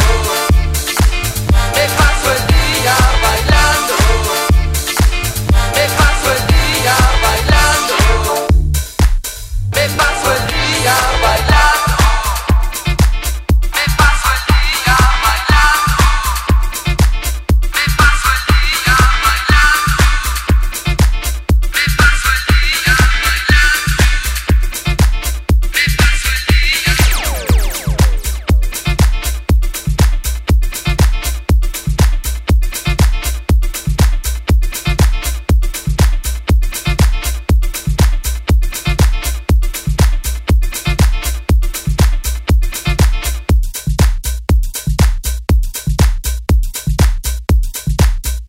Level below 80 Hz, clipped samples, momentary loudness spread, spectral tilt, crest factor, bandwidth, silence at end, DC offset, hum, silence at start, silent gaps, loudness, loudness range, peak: -14 dBFS; under 0.1%; 7 LU; -4 dB/octave; 12 dB; 16.5 kHz; 0 s; under 0.1%; none; 0 s; none; -14 LUFS; 4 LU; 0 dBFS